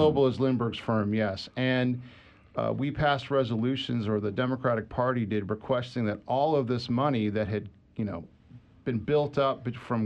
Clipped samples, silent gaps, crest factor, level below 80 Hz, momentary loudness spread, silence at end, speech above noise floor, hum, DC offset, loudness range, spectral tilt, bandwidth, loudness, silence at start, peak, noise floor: under 0.1%; none; 16 dB; -56 dBFS; 9 LU; 0 s; 26 dB; none; under 0.1%; 2 LU; -8 dB/octave; 8.6 kHz; -29 LUFS; 0 s; -12 dBFS; -53 dBFS